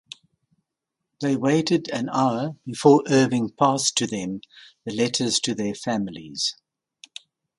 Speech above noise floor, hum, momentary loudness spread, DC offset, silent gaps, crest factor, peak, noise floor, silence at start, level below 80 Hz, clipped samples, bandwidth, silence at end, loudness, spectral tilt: 61 dB; none; 20 LU; under 0.1%; none; 22 dB; -2 dBFS; -83 dBFS; 1.2 s; -64 dBFS; under 0.1%; 11.5 kHz; 1.05 s; -23 LUFS; -4.5 dB/octave